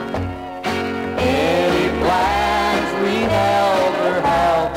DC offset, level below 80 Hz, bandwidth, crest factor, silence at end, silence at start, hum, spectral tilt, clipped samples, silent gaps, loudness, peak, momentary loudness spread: 0.1%; -38 dBFS; 16 kHz; 12 dB; 0 s; 0 s; none; -5 dB/octave; under 0.1%; none; -18 LUFS; -6 dBFS; 7 LU